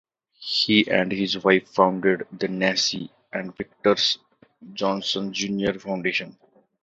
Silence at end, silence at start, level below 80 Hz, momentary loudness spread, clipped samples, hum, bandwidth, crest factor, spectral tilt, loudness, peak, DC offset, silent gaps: 0.55 s; 0.4 s; -62 dBFS; 14 LU; under 0.1%; none; 8 kHz; 22 dB; -4 dB/octave; -23 LUFS; -2 dBFS; under 0.1%; none